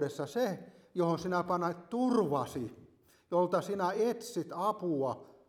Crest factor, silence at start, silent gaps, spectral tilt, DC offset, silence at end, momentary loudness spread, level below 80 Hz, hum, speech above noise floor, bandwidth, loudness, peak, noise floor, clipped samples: 16 dB; 0 s; none; -6.5 dB/octave; under 0.1%; 0.2 s; 8 LU; -72 dBFS; none; 27 dB; 17 kHz; -33 LUFS; -18 dBFS; -60 dBFS; under 0.1%